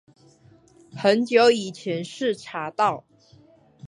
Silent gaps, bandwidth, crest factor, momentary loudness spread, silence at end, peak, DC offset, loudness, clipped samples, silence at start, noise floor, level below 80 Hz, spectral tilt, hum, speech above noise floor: none; 11 kHz; 20 dB; 13 LU; 0 s; -4 dBFS; under 0.1%; -23 LUFS; under 0.1%; 0.95 s; -55 dBFS; -72 dBFS; -4.5 dB/octave; none; 33 dB